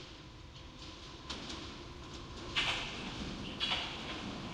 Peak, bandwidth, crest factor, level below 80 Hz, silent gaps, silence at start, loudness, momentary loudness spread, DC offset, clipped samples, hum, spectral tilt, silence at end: -20 dBFS; 16 kHz; 22 dB; -54 dBFS; none; 0 s; -39 LUFS; 16 LU; under 0.1%; under 0.1%; none; -3 dB/octave; 0 s